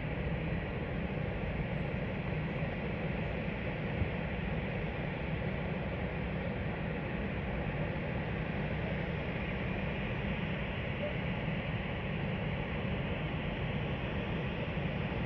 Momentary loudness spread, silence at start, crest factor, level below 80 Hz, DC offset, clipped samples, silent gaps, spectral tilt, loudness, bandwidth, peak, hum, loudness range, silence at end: 1 LU; 0 s; 14 dB; -44 dBFS; under 0.1%; under 0.1%; none; -9 dB/octave; -36 LUFS; 6 kHz; -22 dBFS; none; 1 LU; 0 s